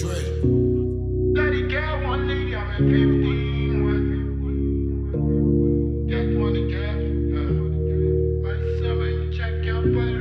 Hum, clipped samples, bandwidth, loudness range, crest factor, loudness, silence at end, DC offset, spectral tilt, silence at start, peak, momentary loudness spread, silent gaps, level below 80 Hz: none; under 0.1%; 8 kHz; 2 LU; 14 dB; -23 LUFS; 0 s; under 0.1%; -8.5 dB/octave; 0 s; -6 dBFS; 6 LU; none; -28 dBFS